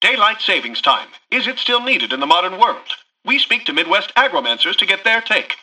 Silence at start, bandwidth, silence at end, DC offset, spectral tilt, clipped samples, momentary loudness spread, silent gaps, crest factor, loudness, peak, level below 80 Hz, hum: 0 s; 11 kHz; 0.05 s; under 0.1%; -1.5 dB/octave; under 0.1%; 5 LU; none; 16 dB; -15 LUFS; 0 dBFS; -66 dBFS; none